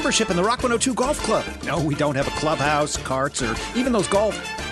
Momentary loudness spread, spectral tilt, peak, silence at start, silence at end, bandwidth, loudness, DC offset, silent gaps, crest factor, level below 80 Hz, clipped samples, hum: 5 LU; -4 dB/octave; -6 dBFS; 0 s; 0 s; 12 kHz; -22 LUFS; under 0.1%; none; 16 dB; -40 dBFS; under 0.1%; none